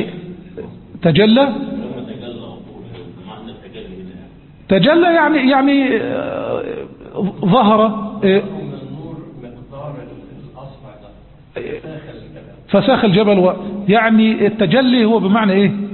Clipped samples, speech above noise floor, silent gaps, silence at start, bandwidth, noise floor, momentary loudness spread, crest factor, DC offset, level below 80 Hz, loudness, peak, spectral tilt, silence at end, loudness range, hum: under 0.1%; 29 dB; none; 0 s; 4.3 kHz; -41 dBFS; 23 LU; 16 dB; under 0.1%; -48 dBFS; -14 LUFS; 0 dBFS; -12 dB/octave; 0 s; 18 LU; none